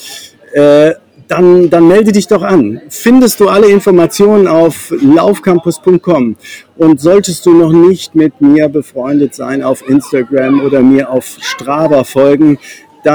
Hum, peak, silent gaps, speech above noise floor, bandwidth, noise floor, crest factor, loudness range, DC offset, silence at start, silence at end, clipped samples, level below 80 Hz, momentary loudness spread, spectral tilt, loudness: none; 0 dBFS; none; 22 dB; over 20 kHz; -30 dBFS; 8 dB; 3 LU; under 0.1%; 0 s; 0 s; 3%; -46 dBFS; 10 LU; -6 dB/octave; -8 LUFS